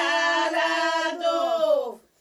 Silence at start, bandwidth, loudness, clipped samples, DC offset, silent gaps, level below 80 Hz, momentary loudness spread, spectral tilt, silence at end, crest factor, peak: 0 s; 13 kHz; -23 LUFS; under 0.1%; under 0.1%; none; -74 dBFS; 3 LU; -0.5 dB/octave; 0.25 s; 12 dB; -10 dBFS